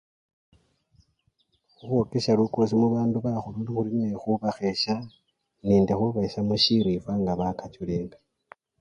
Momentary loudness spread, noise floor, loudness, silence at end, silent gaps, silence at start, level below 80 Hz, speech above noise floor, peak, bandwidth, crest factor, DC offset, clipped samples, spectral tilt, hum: 10 LU; -71 dBFS; -25 LUFS; 0.7 s; none; 1.85 s; -54 dBFS; 46 dB; -8 dBFS; 9.8 kHz; 18 dB; under 0.1%; under 0.1%; -7 dB/octave; none